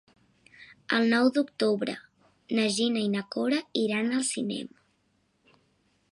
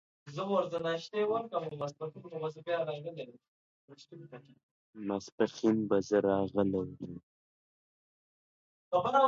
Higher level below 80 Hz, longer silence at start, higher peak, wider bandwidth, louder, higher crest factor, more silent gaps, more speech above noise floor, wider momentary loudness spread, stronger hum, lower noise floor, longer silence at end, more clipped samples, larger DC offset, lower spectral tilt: second, -78 dBFS vs -68 dBFS; first, 0.6 s vs 0.25 s; first, -10 dBFS vs -14 dBFS; first, 11.5 kHz vs 7.6 kHz; first, -27 LUFS vs -34 LUFS; about the same, 18 dB vs 20 dB; second, none vs 3.48-3.88 s, 4.63-4.93 s, 5.32-5.38 s, 7.23-8.91 s; second, 44 dB vs over 57 dB; second, 11 LU vs 21 LU; neither; second, -71 dBFS vs under -90 dBFS; first, 1.45 s vs 0 s; neither; neither; second, -4 dB/octave vs -6.5 dB/octave